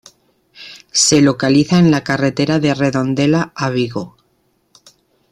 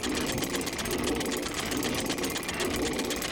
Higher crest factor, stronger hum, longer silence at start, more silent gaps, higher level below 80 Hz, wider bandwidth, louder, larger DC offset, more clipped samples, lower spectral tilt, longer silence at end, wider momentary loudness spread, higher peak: about the same, 16 dB vs 16 dB; neither; first, 0.6 s vs 0 s; neither; about the same, -50 dBFS vs -46 dBFS; second, 13 kHz vs over 20 kHz; first, -14 LUFS vs -30 LUFS; neither; neither; first, -4.5 dB/octave vs -3 dB/octave; first, 1.25 s vs 0 s; first, 13 LU vs 1 LU; first, -2 dBFS vs -14 dBFS